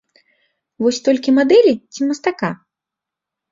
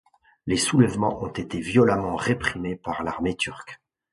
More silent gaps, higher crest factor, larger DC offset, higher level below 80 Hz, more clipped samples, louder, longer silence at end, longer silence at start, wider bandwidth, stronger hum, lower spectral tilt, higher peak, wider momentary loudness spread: neither; about the same, 16 dB vs 20 dB; neither; second, -62 dBFS vs -50 dBFS; neither; first, -16 LUFS vs -24 LUFS; first, 0.95 s vs 0.4 s; first, 0.8 s vs 0.45 s; second, 7.8 kHz vs 11.5 kHz; neither; about the same, -5 dB/octave vs -5 dB/octave; about the same, -2 dBFS vs -4 dBFS; about the same, 12 LU vs 11 LU